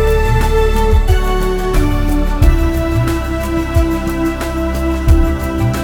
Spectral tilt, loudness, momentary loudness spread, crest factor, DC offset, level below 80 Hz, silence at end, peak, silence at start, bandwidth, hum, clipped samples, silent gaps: -6.5 dB/octave; -15 LUFS; 4 LU; 12 dB; under 0.1%; -14 dBFS; 0 s; 0 dBFS; 0 s; 17.5 kHz; none; under 0.1%; none